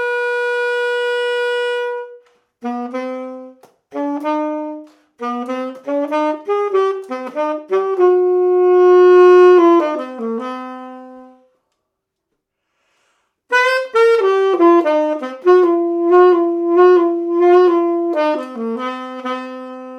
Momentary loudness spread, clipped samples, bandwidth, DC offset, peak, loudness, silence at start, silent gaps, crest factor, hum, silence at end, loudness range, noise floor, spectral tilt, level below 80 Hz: 16 LU; under 0.1%; 8.2 kHz; under 0.1%; 0 dBFS; -15 LUFS; 0 s; none; 14 dB; none; 0 s; 13 LU; -76 dBFS; -4.5 dB/octave; -82 dBFS